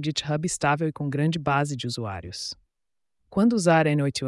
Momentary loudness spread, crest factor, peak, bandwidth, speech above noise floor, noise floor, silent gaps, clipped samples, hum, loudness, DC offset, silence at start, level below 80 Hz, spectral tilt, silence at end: 13 LU; 16 dB; -10 dBFS; 12 kHz; 56 dB; -80 dBFS; none; under 0.1%; none; -25 LUFS; under 0.1%; 0 s; -58 dBFS; -5.5 dB/octave; 0 s